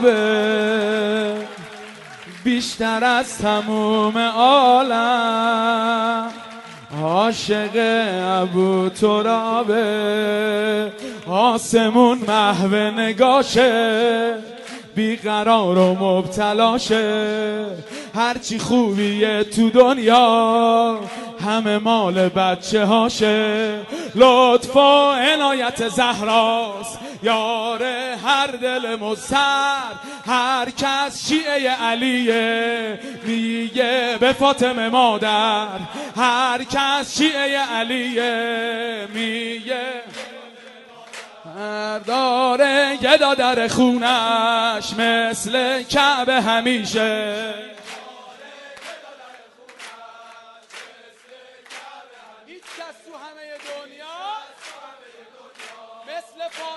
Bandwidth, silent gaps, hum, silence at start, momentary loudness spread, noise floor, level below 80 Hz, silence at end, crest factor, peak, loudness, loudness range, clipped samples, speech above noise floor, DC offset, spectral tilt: 12 kHz; none; none; 0 s; 20 LU; -46 dBFS; -58 dBFS; 0 s; 18 dB; -2 dBFS; -18 LUFS; 10 LU; under 0.1%; 28 dB; under 0.1%; -4 dB/octave